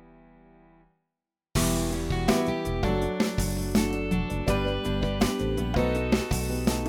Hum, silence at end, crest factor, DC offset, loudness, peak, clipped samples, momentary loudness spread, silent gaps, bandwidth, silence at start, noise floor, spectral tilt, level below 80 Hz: none; 0 s; 18 dB; under 0.1%; -27 LUFS; -10 dBFS; under 0.1%; 3 LU; none; 19 kHz; 1.55 s; -87 dBFS; -5.5 dB/octave; -34 dBFS